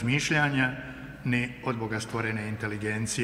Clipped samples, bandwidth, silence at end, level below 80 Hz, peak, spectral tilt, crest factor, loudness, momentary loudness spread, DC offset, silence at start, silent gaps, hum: under 0.1%; 15.5 kHz; 0 s; -54 dBFS; -10 dBFS; -4.5 dB/octave; 18 dB; -29 LUFS; 9 LU; under 0.1%; 0 s; none; none